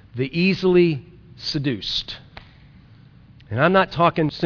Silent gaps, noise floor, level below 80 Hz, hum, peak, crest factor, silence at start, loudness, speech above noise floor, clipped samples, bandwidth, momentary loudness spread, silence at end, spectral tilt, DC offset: none; -48 dBFS; -50 dBFS; none; -4 dBFS; 18 dB; 0.15 s; -20 LUFS; 28 dB; under 0.1%; 5.4 kHz; 14 LU; 0 s; -7 dB/octave; under 0.1%